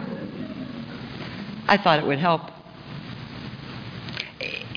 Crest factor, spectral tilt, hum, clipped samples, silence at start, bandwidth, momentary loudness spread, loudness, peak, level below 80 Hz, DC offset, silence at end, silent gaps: 22 dB; -6.5 dB/octave; none; under 0.1%; 0 s; 5.4 kHz; 17 LU; -26 LUFS; -4 dBFS; -56 dBFS; under 0.1%; 0 s; none